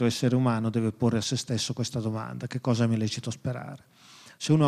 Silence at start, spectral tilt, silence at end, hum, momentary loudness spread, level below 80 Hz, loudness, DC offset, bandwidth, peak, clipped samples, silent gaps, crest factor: 0 s; -6 dB/octave; 0 s; none; 10 LU; -64 dBFS; -28 LUFS; under 0.1%; 14 kHz; -10 dBFS; under 0.1%; none; 16 dB